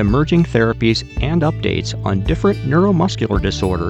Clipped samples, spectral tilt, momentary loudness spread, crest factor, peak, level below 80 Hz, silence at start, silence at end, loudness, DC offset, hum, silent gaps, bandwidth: under 0.1%; -6.5 dB/octave; 5 LU; 14 dB; -2 dBFS; -28 dBFS; 0 s; 0 s; -17 LUFS; under 0.1%; none; none; 11 kHz